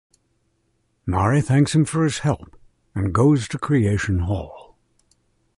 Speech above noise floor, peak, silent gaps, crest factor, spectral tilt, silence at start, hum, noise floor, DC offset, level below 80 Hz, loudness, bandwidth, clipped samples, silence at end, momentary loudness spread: 48 dB; -6 dBFS; none; 16 dB; -6.5 dB/octave; 1.05 s; none; -68 dBFS; under 0.1%; -38 dBFS; -20 LUFS; 11.5 kHz; under 0.1%; 0.95 s; 12 LU